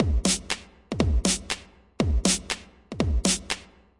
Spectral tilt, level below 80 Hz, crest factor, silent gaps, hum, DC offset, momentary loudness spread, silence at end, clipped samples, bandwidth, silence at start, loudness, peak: -3.5 dB/octave; -32 dBFS; 22 dB; none; none; under 0.1%; 10 LU; 0.35 s; under 0.1%; 11.5 kHz; 0 s; -26 LUFS; -6 dBFS